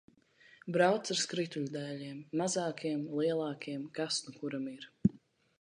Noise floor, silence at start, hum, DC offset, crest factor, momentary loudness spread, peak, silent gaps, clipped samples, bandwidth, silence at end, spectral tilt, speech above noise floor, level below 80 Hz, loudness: -63 dBFS; 0.65 s; none; under 0.1%; 22 dB; 11 LU; -14 dBFS; none; under 0.1%; 11 kHz; 0.45 s; -4.5 dB/octave; 29 dB; -70 dBFS; -35 LUFS